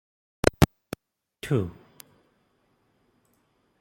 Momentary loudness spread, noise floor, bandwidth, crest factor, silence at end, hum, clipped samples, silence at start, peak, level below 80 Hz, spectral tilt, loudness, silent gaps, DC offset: 20 LU; -69 dBFS; 16.5 kHz; 28 dB; 2.1 s; none; under 0.1%; 0.45 s; -2 dBFS; -44 dBFS; -6 dB/octave; -26 LUFS; none; under 0.1%